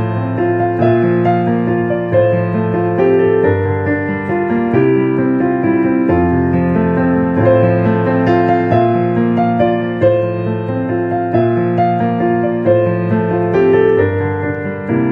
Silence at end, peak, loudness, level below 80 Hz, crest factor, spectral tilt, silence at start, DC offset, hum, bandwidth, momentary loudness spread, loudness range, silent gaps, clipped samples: 0 s; 0 dBFS; -14 LUFS; -42 dBFS; 12 dB; -10.5 dB/octave; 0 s; under 0.1%; none; 5 kHz; 5 LU; 2 LU; none; under 0.1%